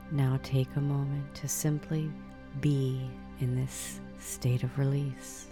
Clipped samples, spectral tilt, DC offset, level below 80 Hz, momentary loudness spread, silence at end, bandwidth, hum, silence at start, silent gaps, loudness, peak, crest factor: under 0.1%; -6 dB/octave; 0.1%; -52 dBFS; 10 LU; 0 s; 18.5 kHz; none; 0 s; none; -32 LUFS; -16 dBFS; 16 dB